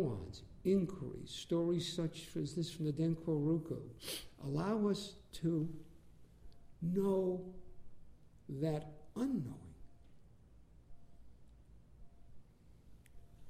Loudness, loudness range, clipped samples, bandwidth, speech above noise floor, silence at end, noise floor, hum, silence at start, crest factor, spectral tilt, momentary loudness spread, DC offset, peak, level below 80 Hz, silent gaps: -39 LUFS; 6 LU; under 0.1%; 15.5 kHz; 25 dB; 0 s; -63 dBFS; none; 0 s; 18 dB; -7 dB/octave; 14 LU; under 0.1%; -24 dBFS; -62 dBFS; none